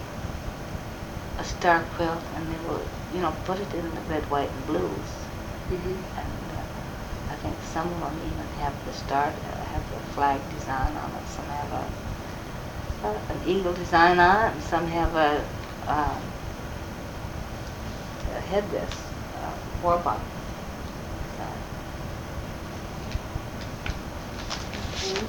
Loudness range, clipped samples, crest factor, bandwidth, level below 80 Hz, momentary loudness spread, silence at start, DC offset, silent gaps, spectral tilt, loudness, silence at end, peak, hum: 10 LU; under 0.1%; 24 dB; 19 kHz; -40 dBFS; 12 LU; 0 s; under 0.1%; none; -5.5 dB/octave; -29 LUFS; 0 s; -6 dBFS; none